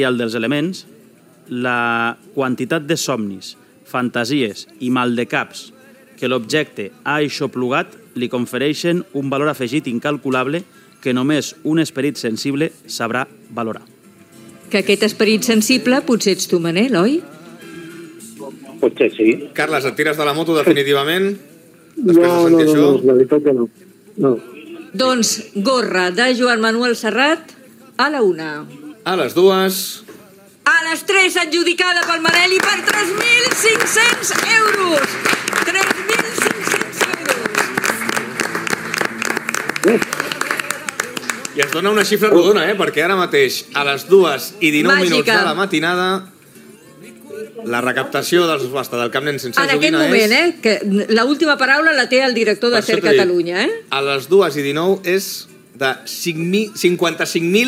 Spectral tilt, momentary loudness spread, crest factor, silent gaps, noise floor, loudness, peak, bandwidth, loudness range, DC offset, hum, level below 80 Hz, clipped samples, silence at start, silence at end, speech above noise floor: -3.5 dB/octave; 12 LU; 16 dB; none; -47 dBFS; -16 LUFS; 0 dBFS; 16.5 kHz; 7 LU; under 0.1%; none; -68 dBFS; under 0.1%; 0 s; 0 s; 31 dB